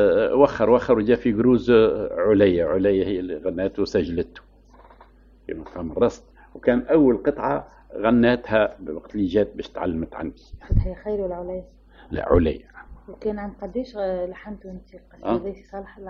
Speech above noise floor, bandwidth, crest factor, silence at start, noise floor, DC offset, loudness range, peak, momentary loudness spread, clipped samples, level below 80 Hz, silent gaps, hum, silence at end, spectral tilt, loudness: 29 dB; 7.2 kHz; 20 dB; 0 s; -51 dBFS; under 0.1%; 8 LU; -2 dBFS; 17 LU; under 0.1%; -38 dBFS; none; none; 0 s; -8 dB/octave; -22 LUFS